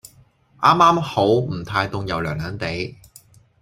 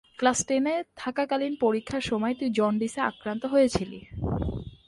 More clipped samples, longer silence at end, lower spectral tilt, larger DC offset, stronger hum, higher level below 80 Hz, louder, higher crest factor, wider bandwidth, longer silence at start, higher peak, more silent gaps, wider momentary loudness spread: neither; first, 0.7 s vs 0.15 s; about the same, -6 dB/octave vs -5 dB/octave; neither; neither; about the same, -48 dBFS vs -46 dBFS; first, -19 LUFS vs -27 LUFS; about the same, 20 dB vs 18 dB; first, 16 kHz vs 11.5 kHz; first, 0.6 s vs 0.2 s; first, 0 dBFS vs -10 dBFS; neither; first, 12 LU vs 9 LU